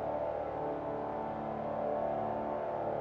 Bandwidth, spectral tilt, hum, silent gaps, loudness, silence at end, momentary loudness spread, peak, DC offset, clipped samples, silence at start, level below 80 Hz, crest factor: 6.4 kHz; -9 dB/octave; none; none; -37 LUFS; 0 s; 3 LU; -22 dBFS; under 0.1%; under 0.1%; 0 s; -60 dBFS; 14 dB